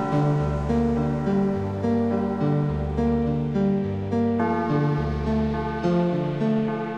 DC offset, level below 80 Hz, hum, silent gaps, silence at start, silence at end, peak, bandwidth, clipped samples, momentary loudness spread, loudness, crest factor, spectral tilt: under 0.1%; -36 dBFS; none; none; 0 s; 0 s; -10 dBFS; 7.6 kHz; under 0.1%; 3 LU; -24 LUFS; 14 dB; -9 dB/octave